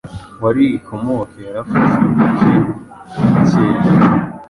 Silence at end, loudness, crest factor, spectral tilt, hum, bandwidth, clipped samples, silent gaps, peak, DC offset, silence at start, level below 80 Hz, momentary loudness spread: 0.05 s; -14 LUFS; 12 dB; -9 dB/octave; none; 11 kHz; under 0.1%; none; -2 dBFS; under 0.1%; 0.05 s; -42 dBFS; 14 LU